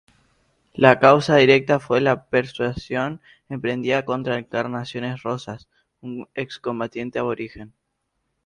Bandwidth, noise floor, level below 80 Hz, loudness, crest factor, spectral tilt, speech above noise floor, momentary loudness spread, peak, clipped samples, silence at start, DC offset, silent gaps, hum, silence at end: 10.5 kHz; -75 dBFS; -54 dBFS; -21 LUFS; 22 dB; -6 dB/octave; 54 dB; 20 LU; 0 dBFS; under 0.1%; 0.75 s; under 0.1%; none; none; 0.8 s